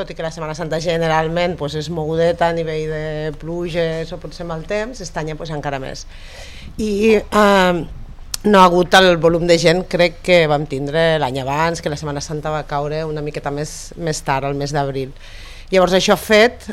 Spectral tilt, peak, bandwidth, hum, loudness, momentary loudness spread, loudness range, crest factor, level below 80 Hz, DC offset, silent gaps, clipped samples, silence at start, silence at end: -5 dB/octave; 0 dBFS; 16 kHz; none; -17 LUFS; 16 LU; 10 LU; 18 dB; -36 dBFS; under 0.1%; none; under 0.1%; 0 s; 0 s